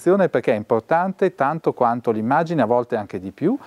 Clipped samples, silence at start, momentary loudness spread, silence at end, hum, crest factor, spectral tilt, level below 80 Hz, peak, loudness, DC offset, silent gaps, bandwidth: under 0.1%; 0 s; 5 LU; 0 s; none; 14 dB; -8 dB/octave; -68 dBFS; -4 dBFS; -20 LUFS; under 0.1%; none; 12 kHz